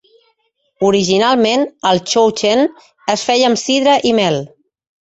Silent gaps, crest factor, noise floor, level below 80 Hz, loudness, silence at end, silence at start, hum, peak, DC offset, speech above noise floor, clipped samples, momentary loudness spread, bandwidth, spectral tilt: none; 14 dB; -64 dBFS; -56 dBFS; -14 LUFS; 0.55 s; 0.8 s; none; -2 dBFS; under 0.1%; 51 dB; under 0.1%; 7 LU; 8.2 kHz; -4 dB/octave